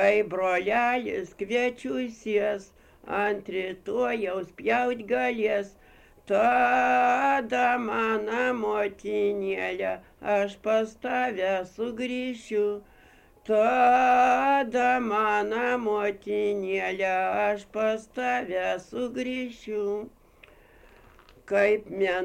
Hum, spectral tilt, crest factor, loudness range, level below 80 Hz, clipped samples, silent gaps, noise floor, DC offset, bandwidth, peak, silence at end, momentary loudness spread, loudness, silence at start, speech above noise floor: none; -5 dB/octave; 18 dB; 6 LU; -60 dBFS; under 0.1%; none; -56 dBFS; under 0.1%; 15.5 kHz; -10 dBFS; 0 s; 10 LU; -26 LUFS; 0 s; 30 dB